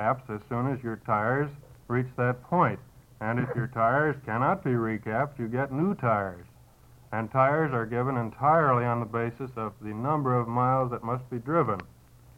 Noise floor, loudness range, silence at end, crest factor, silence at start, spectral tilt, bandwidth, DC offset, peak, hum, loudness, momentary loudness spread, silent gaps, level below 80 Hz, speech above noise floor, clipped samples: -55 dBFS; 2 LU; 0.5 s; 18 dB; 0 s; -9.5 dB/octave; 10 kHz; under 0.1%; -10 dBFS; none; -28 LUFS; 10 LU; none; -58 dBFS; 27 dB; under 0.1%